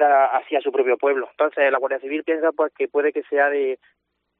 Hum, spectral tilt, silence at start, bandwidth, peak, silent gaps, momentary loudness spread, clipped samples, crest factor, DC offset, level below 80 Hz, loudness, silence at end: none; 0.5 dB/octave; 0 s; 3.9 kHz; -6 dBFS; none; 6 LU; under 0.1%; 16 dB; under 0.1%; -80 dBFS; -21 LUFS; 0.65 s